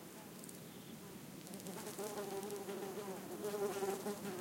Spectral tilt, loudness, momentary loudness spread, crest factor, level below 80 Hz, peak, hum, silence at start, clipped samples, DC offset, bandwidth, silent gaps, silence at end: -4 dB/octave; -46 LUFS; 11 LU; 18 dB; -82 dBFS; -26 dBFS; none; 0 s; under 0.1%; under 0.1%; 17 kHz; none; 0 s